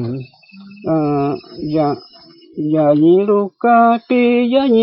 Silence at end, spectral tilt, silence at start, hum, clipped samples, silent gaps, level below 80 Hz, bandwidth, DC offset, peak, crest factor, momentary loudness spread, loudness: 0 s; -11 dB/octave; 0 s; none; under 0.1%; none; -56 dBFS; 5.6 kHz; under 0.1%; -2 dBFS; 14 dB; 14 LU; -15 LUFS